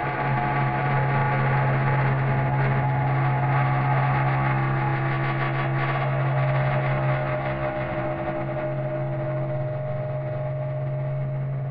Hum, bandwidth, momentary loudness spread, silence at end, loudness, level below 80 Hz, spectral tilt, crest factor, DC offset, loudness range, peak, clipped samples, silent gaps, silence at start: none; 4.8 kHz; 6 LU; 0 s; -24 LUFS; -48 dBFS; -7 dB/octave; 14 dB; under 0.1%; 6 LU; -10 dBFS; under 0.1%; none; 0 s